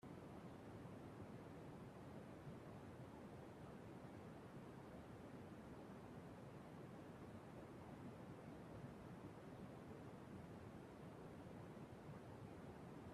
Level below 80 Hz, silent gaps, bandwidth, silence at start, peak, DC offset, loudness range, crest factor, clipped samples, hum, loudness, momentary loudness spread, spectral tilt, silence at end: -76 dBFS; none; 14 kHz; 0.05 s; -44 dBFS; under 0.1%; 1 LU; 12 dB; under 0.1%; none; -58 LUFS; 1 LU; -7 dB/octave; 0 s